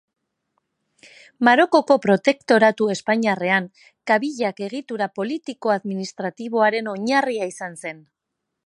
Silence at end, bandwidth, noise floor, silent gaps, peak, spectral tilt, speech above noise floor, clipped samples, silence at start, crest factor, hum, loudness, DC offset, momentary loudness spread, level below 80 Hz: 0.7 s; 11.5 kHz; -80 dBFS; none; -2 dBFS; -5 dB/octave; 60 dB; under 0.1%; 1.4 s; 20 dB; none; -20 LUFS; under 0.1%; 14 LU; -74 dBFS